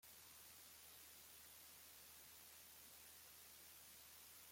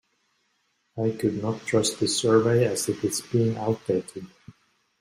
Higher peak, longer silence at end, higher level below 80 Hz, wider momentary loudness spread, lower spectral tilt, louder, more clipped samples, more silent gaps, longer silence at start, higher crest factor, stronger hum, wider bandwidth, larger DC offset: second, -50 dBFS vs -6 dBFS; second, 0 s vs 0.5 s; second, -86 dBFS vs -62 dBFS; second, 0 LU vs 13 LU; second, -0.5 dB/octave vs -5 dB/octave; second, -60 LUFS vs -25 LUFS; neither; neither; second, 0 s vs 0.95 s; second, 14 dB vs 20 dB; neither; about the same, 16.5 kHz vs 16 kHz; neither